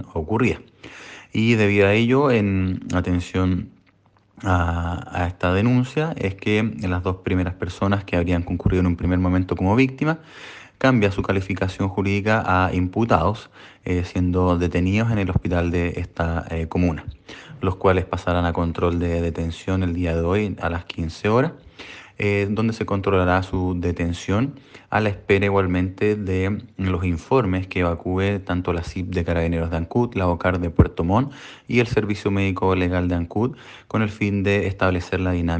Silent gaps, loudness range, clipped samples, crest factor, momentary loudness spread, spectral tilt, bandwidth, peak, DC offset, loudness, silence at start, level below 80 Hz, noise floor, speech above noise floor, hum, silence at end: none; 3 LU; under 0.1%; 22 dB; 8 LU; -7.5 dB/octave; 8.6 kHz; 0 dBFS; under 0.1%; -22 LUFS; 0 s; -38 dBFS; -58 dBFS; 37 dB; none; 0 s